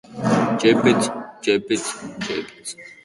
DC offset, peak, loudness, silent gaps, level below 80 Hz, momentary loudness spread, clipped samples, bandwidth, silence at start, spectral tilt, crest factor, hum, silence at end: under 0.1%; -2 dBFS; -20 LUFS; none; -58 dBFS; 15 LU; under 0.1%; 11.5 kHz; 0.1 s; -4.5 dB/octave; 20 dB; none; 0.1 s